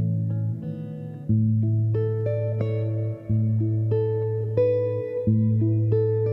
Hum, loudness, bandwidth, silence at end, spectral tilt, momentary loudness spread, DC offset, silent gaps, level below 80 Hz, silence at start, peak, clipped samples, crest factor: none; -24 LUFS; 2.9 kHz; 0 s; -12.5 dB/octave; 7 LU; under 0.1%; none; -56 dBFS; 0 s; -10 dBFS; under 0.1%; 14 dB